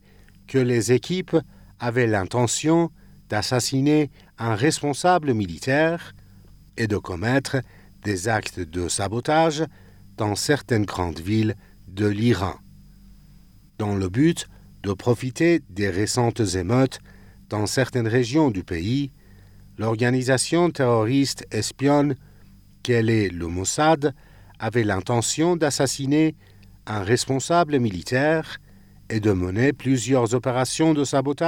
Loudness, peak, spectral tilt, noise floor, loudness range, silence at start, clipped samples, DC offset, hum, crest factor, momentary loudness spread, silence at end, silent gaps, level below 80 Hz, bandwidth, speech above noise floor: -22 LUFS; -6 dBFS; -5 dB/octave; -50 dBFS; 3 LU; 0.5 s; under 0.1%; under 0.1%; none; 16 dB; 10 LU; 0 s; none; -52 dBFS; 17 kHz; 28 dB